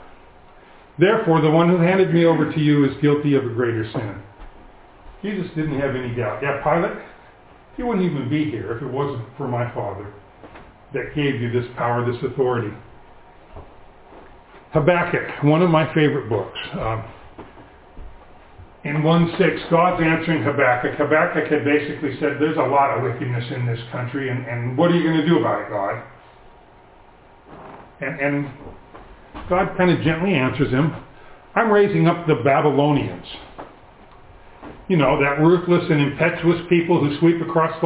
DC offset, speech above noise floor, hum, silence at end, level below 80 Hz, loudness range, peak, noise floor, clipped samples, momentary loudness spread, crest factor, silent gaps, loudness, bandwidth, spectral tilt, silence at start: under 0.1%; 29 dB; none; 0 s; -48 dBFS; 8 LU; -2 dBFS; -48 dBFS; under 0.1%; 14 LU; 18 dB; none; -20 LUFS; 4 kHz; -11 dB/octave; 0 s